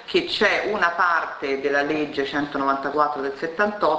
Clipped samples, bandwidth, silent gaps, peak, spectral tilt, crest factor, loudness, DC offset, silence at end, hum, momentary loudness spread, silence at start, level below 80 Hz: under 0.1%; 8 kHz; none; -4 dBFS; -4.5 dB/octave; 18 dB; -22 LUFS; under 0.1%; 0 s; none; 6 LU; 0 s; -58 dBFS